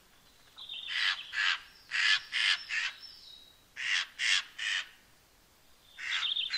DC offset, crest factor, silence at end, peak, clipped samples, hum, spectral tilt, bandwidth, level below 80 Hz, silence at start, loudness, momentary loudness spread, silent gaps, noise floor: under 0.1%; 24 dB; 0 s; -12 dBFS; under 0.1%; none; 3.5 dB/octave; 16 kHz; -72 dBFS; 0.55 s; -30 LUFS; 20 LU; none; -63 dBFS